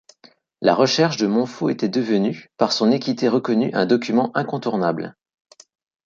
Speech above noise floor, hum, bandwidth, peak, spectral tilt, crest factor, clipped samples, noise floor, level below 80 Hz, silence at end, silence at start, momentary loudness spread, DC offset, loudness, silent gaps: 35 dB; none; 7.6 kHz; -2 dBFS; -5.5 dB/octave; 18 dB; under 0.1%; -54 dBFS; -66 dBFS; 0.95 s; 0.6 s; 6 LU; under 0.1%; -20 LUFS; none